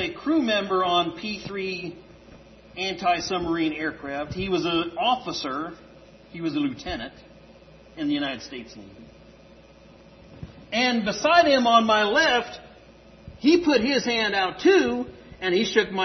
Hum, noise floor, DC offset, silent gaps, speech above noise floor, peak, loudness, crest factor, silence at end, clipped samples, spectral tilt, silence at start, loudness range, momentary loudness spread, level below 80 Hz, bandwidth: none; -50 dBFS; under 0.1%; none; 27 dB; -4 dBFS; -23 LUFS; 20 dB; 0 s; under 0.1%; -4 dB/octave; 0 s; 11 LU; 19 LU; -54 dBFS; 6.4 kHz